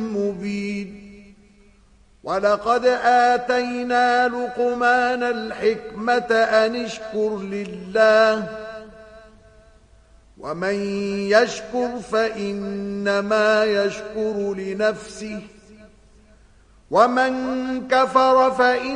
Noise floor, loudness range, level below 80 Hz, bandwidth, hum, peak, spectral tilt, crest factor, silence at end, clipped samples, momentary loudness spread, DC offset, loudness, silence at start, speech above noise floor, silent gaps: -54 dBFS; 5 LU; -54 dBFS; 10.5 kHz; none; -2 dBFS; -4.5 dB/octave; 20 dB; 0 s; under 0.1%; 13 LU; under 0.1%; -20 LUFS; 0 s; 34 dB; none